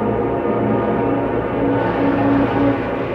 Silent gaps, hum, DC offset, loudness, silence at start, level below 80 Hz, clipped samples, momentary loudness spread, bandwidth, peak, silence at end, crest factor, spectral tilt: none; none; under 0.1%; -18 LUFS; 0 s; -38 dBFS; under 0.1%; 3 LU; 5.2 kHz; -4 dBFS; 0 s; 12 dB; -9.5 dB/octave